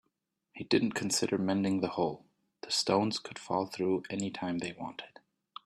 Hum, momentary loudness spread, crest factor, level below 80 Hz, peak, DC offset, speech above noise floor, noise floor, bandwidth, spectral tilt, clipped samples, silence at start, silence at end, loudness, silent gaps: none; 18 LU; 20 dB; -72 dBFS; -14 dBFS; under 0.1%; 50 dB; -82 dBFS; 13.5 kHz; -4 dB/octave; under 0.1%; 0.55 s; 0.55 s; -32 LUFS; none